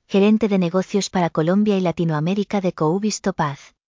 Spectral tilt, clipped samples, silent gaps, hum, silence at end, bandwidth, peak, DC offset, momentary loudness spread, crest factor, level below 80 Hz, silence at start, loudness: -6 dB/octave; under 0.1%; none; none; 0.45 s; 7.6 kHz; -6 dBFS; under 0.1%; 6 LU; 12 dB; -56 dBFS; 0.1 s; -20 LUFS